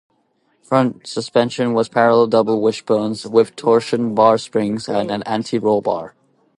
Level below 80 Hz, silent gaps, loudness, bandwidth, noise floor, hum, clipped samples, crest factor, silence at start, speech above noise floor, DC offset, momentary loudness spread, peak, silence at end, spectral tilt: -62 dBFS; none; -17 LUFS; 11 kHz; -63 dBFS; none; under 0.1%; 18 dB; 0.7 s; 46 dB; under 0.1%; 7 LU; 0 dBFS; 0.5 s; -6 dB/octave